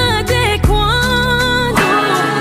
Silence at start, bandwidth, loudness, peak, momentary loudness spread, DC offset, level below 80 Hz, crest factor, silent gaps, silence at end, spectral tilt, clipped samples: 0 s; 16 kHz; -13 LUFS; 0 dBFS; 1 LU; under 0.1%; -22 dBFS; 12 dB; none; 0 s; -4.5 dB/octave; under 0.1%